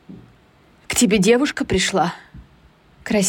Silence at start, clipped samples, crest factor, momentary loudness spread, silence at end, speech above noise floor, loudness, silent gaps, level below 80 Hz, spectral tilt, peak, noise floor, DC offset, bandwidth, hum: 0.1 s; under 0.1%; 16 dB; 13 LU; 0 s; 35 dB; -18 LUFS; none; -46 dBFS; -4 dB/octave; -4 dBFS; -53 dBFS; under 0.1%; 17 kHz; none